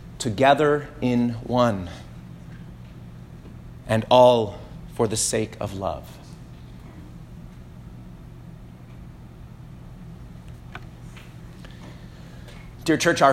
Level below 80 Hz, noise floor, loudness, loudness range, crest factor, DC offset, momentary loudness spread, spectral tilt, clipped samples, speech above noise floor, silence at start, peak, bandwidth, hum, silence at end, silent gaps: -46 dBFS; -42 dBFS; -21 LUFS; 20 LU; 22 dB; under 0.1%; 25 LU; -4.5 dB/octave; under 0.1%; 22 dB; 0 s; -2 dBFS; 16 kHz; none; 0 s; none